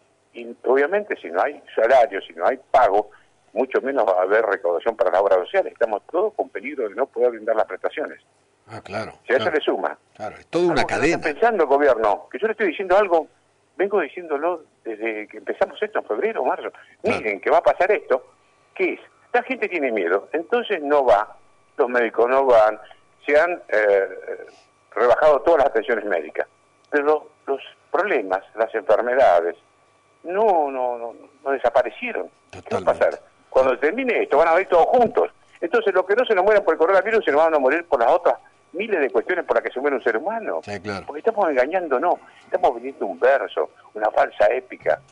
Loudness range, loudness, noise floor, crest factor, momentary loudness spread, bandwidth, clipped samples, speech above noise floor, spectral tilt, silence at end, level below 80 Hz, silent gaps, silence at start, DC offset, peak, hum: 5 LU; -21 LUFS; -58 dBFS; 12 dB; 13 LU; 10.5 kHz; under 0.1%; 38 dB; -5 dB/octave; 0.15 s; -56 dBFS; none; 0.35 s; under 0.1%; -8 dBFS; none